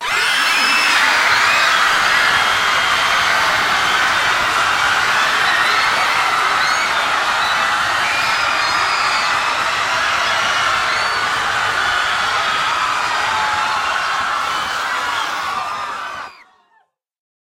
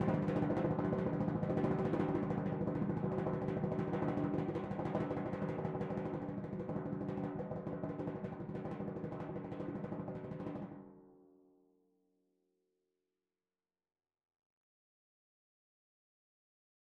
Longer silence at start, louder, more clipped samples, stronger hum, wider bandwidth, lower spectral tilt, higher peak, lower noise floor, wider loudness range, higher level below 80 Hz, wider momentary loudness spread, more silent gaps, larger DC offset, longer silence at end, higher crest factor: about the same, 0 s vs 0 s; first, -15 LUFS vs -39 LUFS; neither; neither; first, 16 kHz vs 7 kHz; second, 0 dB/octave vs -10 dB/octave; first, -2 dBFS vs -22 dBFS; second, -59 dBFS vs under -90 dBFS; second, 6 LU vs 11 LU; first, -50 dBFS vs -64 dBFS; about the same, 7 LU vs 9 LU; neither; neither; second, 1.25 s vs 5.65 s; about the same, 14 dB vs 18 dB